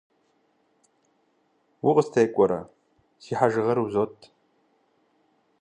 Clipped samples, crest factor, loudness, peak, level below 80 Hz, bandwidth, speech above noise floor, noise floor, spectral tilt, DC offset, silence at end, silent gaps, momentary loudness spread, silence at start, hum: under 0.1%; 22 dB; -24 LUFS; -4 dBFS; -66 dBFS; 9.8 kHz; 45 dB; -68 dBFS; -7 dB/octave; under 0.1%; 1.5 s; none; 10 LU; 1.85 s; none